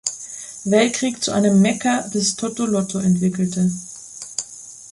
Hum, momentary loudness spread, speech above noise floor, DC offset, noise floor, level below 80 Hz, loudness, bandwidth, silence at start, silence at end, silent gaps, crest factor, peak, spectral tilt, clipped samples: none; 15 LU; 21 dB; under 0.1%; -39 dBFS; -58 dBFS; -20 LUFS; 11.5 kHz; 0.05 s; 0 s; none; 18 dB; -2 dBFS; -4.5 dB/octave; under 0.1%